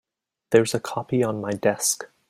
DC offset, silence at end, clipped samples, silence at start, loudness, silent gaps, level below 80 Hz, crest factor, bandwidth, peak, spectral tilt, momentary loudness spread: under 0.1%; 0.25 s; under 0.1%; 0.5 s; -23 LUFS; none; -64 dBFS; 20 dB; 16 kHz; -4 dBFS; -4 dB/octave; 6 LU